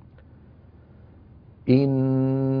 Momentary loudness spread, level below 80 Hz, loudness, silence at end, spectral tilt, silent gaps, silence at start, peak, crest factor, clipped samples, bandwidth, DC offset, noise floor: 4 LU; -54 dBFS; -22 LUFS; 0 s; -11.5 dB/octave; none; 1.65 s; -6 dBFS; 20 dB; under 0.1%; 5 kHz; under 0.1%; -50 dBFS